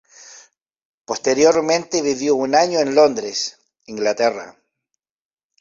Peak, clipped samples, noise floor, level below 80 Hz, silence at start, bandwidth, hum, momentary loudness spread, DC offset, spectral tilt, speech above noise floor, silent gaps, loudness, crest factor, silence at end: -2 dBFS; under 0.1%; -79 dBFS; -62 dBFS; 0.2 s; 7.6 kHz; none; 12 LU; under 0.1%; -3 dB/octave; 62 dB; 0.62-0.66 s, 0.82-1.04 s; -18 LUFS; 18 dB; 1.1 s